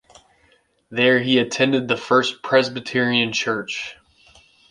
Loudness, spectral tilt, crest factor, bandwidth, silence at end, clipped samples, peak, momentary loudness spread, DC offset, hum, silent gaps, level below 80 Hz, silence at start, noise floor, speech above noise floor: -19 LUFS; -4 dB/octave; 20 dB; 10.5 kHz; 0.8 s; under 0.1%; -2 dBFS; 11 LU; under 0.1%; none; none; -62 dBFS; 0.9 s; -60 dBFS; 40 dB